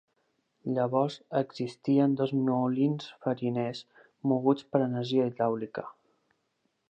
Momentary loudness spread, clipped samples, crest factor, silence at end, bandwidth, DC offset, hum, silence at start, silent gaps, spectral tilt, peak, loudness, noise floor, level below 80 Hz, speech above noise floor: 9 LU; under 0.1%; 20 dB; 1 s; 8.6 kHz; under 0.1%; none; 0.65 s; none; -8 dB/octave; -10 dBFS; -29 LUFS; -77 dBFS; -80 dBFS; 49 dB